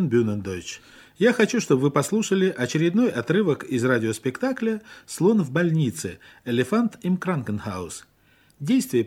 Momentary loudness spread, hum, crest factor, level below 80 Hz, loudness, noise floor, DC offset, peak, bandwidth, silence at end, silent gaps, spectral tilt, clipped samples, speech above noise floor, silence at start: 13 LU; none; 18 dB; -62 dBFS; -23 LUFS; -59 dBFS; under 0.1%; -4 dBFS; 16 kHz; 0 s; none; -6 dB/octave; under 0.1%; 36 dB; 0 s